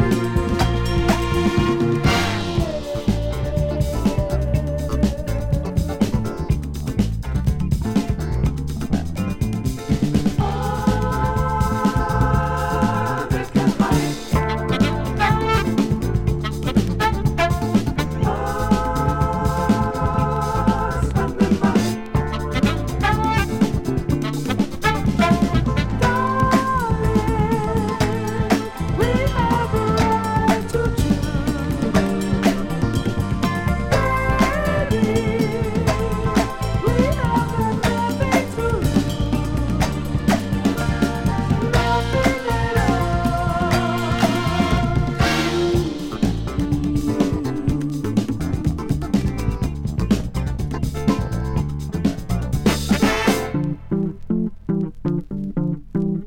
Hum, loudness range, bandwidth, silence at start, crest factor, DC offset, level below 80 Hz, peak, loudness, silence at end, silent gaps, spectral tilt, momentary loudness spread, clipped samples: none; 3 LU; 17 kHz; 0 s; 16 dB; under 0.1%; -28 dBFS; -4 dBFS; -21 LUFS; 0 s; none; -6.5 dB/octave; 5 LU; under 0.1%